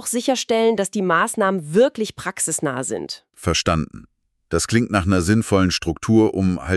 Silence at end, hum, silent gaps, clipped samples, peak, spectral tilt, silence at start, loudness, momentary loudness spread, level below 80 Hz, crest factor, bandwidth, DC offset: 0 s; none; none; under 0.1%; -4 dBFS; -4.5 dB/octave; 0 s; -20 LUFS; 9 LU; -42 dBFS; 16 dB; 13.5 kHz; under 0.1%